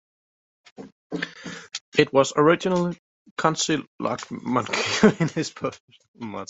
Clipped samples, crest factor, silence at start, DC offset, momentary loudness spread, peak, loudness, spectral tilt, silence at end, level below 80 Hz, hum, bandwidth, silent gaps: under 0.1%; 22 dB; 0.8 s; under 0.1%; 17 LU; -2 dBFS; -23 LUFS; -4.5 dB/octave; 0.05 s; -62 dBFS; none; 8.2 kHz; 0.92-1.10 s, 1.81-1.92 s, 2.99-3.25 s, 3.31-3.36 s, 3.87-3.99 s, 5.80-5.88 s, 6.08-6.14 s